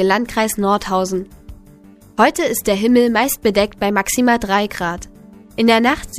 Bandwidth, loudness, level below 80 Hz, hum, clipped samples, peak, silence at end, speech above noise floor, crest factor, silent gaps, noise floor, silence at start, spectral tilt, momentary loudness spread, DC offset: 15.5 kHz; -16 LUFS; -42 dBFS; none; under 0.1%; 0 dBFS; 0 s; 28 dB; 16 dB; none; -44 dBFS; 0 s; -4 dB/octave; 11 LU; under 0.1%